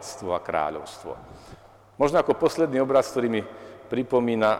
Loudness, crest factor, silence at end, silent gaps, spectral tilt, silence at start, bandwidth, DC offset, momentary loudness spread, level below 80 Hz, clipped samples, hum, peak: -24 LUFS; 16 dB; 0 s; none; -5.5 dB/octave; 0 s; 16 kHz; under 0.1%; 17 LU; -56 dBFS; under 0.1%; none; -8 dBFS